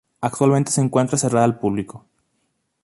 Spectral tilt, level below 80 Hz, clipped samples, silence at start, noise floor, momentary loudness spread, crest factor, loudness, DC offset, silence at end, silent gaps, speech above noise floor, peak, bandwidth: -6 dB/octave; -56 dBFS; under 0.1%; 0.2 s; -71 dBFS; 10 LU; 18 dB; -19 LUFS; under 0.1%; 0.85 s; none; 52 dB; -4 dBFS; 11.5 kHz